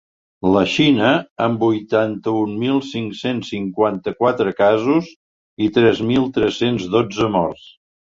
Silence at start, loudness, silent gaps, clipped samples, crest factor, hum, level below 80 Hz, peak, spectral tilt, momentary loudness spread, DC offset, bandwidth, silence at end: 0.45 s; -18 LUFS; 1.30-1.36 s, 5.16-5.57 s; under 0.1%; 16 dB; none; -50 dBFS; -2 dBFS; -6.5 dB/octave; 9 LU; under 0.1%; 7.6 kHz; 0.55 s